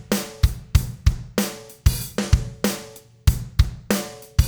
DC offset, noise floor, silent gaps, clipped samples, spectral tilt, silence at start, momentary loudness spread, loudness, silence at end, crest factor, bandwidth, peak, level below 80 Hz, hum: under 0.1%; -42 dBFS; none; under 0.1%; -5 dB/octave; 0 s; 4 LU; -24 LUFS; 0 s; 20 dB; over 20 kHz; -2 dBFS; -26 dBFS; none